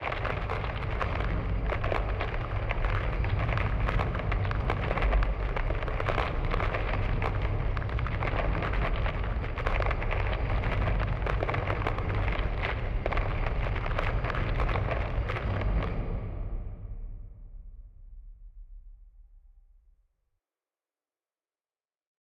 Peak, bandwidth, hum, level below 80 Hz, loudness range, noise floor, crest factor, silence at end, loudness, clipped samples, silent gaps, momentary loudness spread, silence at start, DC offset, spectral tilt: -10 dBFS; 6 kHz; none; -32 dBFS; 6 LU; under -90 dBFS; 20 dB; 2.9 s; -31 LUFS; under 0.1%; none; 4 LU; 0 s; under 0.1%; -8 dB/octave